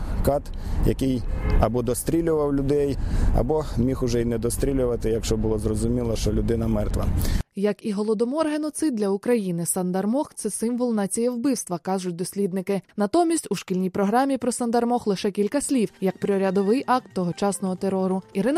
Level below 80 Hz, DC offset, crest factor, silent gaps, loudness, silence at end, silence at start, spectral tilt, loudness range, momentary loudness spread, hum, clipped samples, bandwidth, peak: -32 dBFS; under 0.1%; 16 dB; none; -24 LUFS; 0 s; 0 s; -6 dB/octave; 2 LU; 4 LU; none; under 0.1%; 15.5 kHz; -8 dBFS